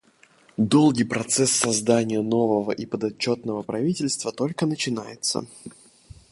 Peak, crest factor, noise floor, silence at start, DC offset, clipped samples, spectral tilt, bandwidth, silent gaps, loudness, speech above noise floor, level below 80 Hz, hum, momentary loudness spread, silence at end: -4 dBFS; 20 dB; -57 dBFS; 0.6 s; under 0.1%; under 0.1%; -4 dB/octave; 11.5 kHz; none; -23 LUFS; 34 dB; -60 dBFS; none; 10 LU; 0.65 s